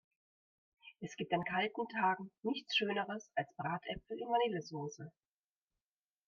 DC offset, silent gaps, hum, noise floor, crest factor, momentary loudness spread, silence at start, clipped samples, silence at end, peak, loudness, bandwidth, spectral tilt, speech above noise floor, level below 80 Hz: under 0.1%; none; none; under -90 dBFS; 20 dB; 12 LU; 0.85 s; under 0.1%; 1.2 s; -20 dBFS; -38 LUFS; 7.4 kHz; -5 dB/octave; over 52 dB; -72 dBFS